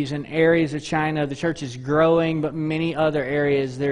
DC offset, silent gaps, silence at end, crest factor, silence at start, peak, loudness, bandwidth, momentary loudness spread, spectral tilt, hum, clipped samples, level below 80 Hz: under 0.1%; none; 0 s; 16 dB; 0 s; -6 dBFS; -22 LUFS; 10.5 kHz; 7 LU; -6.5 dB/octave; none; under 0.1%; -52 dBFS